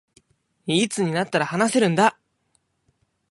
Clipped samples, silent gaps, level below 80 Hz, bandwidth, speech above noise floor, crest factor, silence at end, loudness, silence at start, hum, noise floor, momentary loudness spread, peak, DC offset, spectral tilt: under 0.1%; none; -68 dBFS; 11.5 kHz; 48 dB; 20 dB; 1.2 s; -21 LUFS; 0.65 s; none; -69 dBFS; 5 LU; -4 dBFS; under 0.1%; -4.5 dB/octave